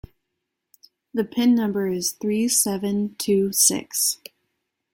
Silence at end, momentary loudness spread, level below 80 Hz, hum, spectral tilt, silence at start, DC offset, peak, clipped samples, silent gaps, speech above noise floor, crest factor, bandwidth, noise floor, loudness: 0.8 s; 9 LU; -58 dBFS; none; -3.5 dB/octave; 1.15 s; under 0.1%; -2 dBFS; under 0.1%; none; 58 dB; 20 dB; 17 kHz; -80 dBFS; -21 LUFS